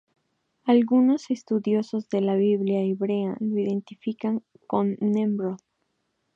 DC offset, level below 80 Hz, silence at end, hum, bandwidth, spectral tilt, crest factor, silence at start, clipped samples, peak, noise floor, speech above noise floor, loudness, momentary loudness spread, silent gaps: under 0.1%; -76 dBFS; 0.8 s; none; 7.4 kHz; -8 dB/octave; 16 dB; 0.65 s; under 0.1%; -8 dBFS; -75 dBFS; 51 dB; -25 LUFS; 10 LU; none